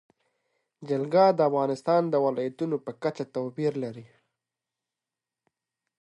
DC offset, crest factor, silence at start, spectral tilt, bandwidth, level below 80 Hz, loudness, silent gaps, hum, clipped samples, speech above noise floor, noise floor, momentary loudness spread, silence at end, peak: under 0.1%; 20 dB; 0.8 s; -7.5 dB/octave; 11 kHz; -80 dBFS; -26 LUFS; none; none; under 0.1%; 64 dB; -90 dBFS; 12 LU; 1.95 s; -10 dBFS